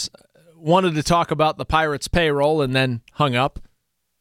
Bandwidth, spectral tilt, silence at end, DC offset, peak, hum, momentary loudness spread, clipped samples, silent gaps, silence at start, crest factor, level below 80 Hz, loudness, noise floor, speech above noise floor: 16.5 kHz; -5 dB/octave; 0.6 s; under 0.1%; -4 dBFS; none; 6 LU; under 0.1%; none; 0 s; 16 dB; -38 dBFS; -20 LUFS; -71 dBFS; 52 dB